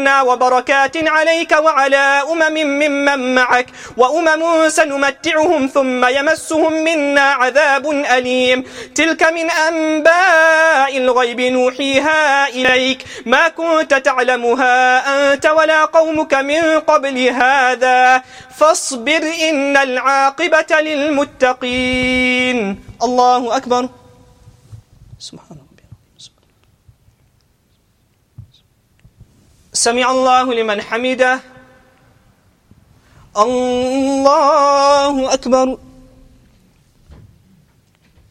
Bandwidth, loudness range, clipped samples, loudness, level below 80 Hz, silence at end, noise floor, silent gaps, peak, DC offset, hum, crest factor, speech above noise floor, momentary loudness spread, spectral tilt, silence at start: 15.5 kHz; 7 LU; under 0.1%; -13 LUFS; -50 dBFS; 2.55 s; -58 dBFS; none; 0 dBFS; under 0.1%; none; 14 dB; 44 dB; 6 LU; -2.5 dB/octave; 0 s